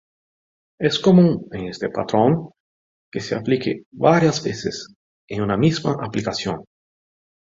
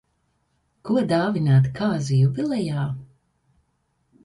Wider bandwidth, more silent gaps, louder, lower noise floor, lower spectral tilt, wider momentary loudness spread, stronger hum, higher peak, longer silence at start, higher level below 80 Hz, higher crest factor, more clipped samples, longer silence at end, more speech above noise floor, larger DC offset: second, 7.8 kHz vs 11 kHz; first, 2.60-3.12 s, 3.86-3.92 s, 4.95-5.28 s vs none; about the same, -20 LUFS vs -22 LUFS; first, under -90 dBFS vs -70 dBFS; second, -6.5 dB/octave vs -8 dB/octave; first, 16 LU vs 10 LU; neither; first, -2 dBFS vs -8 dBFS; about the same, 0.8 s vs 0.85 s; about the same, -54 dBFS vs -56 dBFS; about the same, 20 dB vs 16 dB; neither; second, 0.95 s vs 1.2 s; first, over 71 dB vs 49 dB; neither